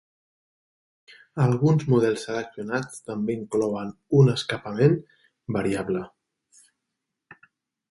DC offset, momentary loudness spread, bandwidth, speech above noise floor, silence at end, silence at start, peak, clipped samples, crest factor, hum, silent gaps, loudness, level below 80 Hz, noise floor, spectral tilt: under 0.1%; 12 LU; 11.5 kHz; 59 dB; 1.85 s; 1.35 s; -6 dBFS; under 0.1%; 20 dB; none; none; -24 LUFS; -60 dBFS; -83 dBFS; -7 dB/octave